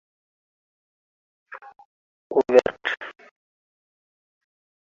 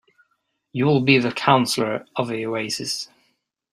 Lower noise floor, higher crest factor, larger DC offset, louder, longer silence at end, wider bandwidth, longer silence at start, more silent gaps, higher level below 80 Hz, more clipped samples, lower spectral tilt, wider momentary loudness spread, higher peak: first, under -90 dBFS vs -72 dBFS; first, 26 dB vs 20 dB; neither; about the same, -22 LUFS vs -21 LUFS; first, 1.75 s vs 0.65 s; second, 7.4 kHz vs 16 kHz; first, 1.5 s vs 0.75 s; first, 1.85-2.30 s vs none; about the same, -66 dBFS vs -62 dBFS; neither; second, -2 dB/octave vs -5 dB/octave; first, 25 LU vs 11 LU; about the same, -2 dBFS vs -2 dBFS